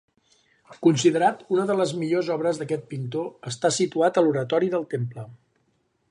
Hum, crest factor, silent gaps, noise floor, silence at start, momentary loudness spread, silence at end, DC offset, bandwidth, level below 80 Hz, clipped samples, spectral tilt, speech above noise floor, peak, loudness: none; 18 dB; none; -69 dBFS; 0.7 s; 11 LU; 0.75 s; under 0.1%; 11 kHz; -70 dBFS; under 0.1%; -5.5 dB/octave; 46 dB; -6 dBFS; -24 LUFS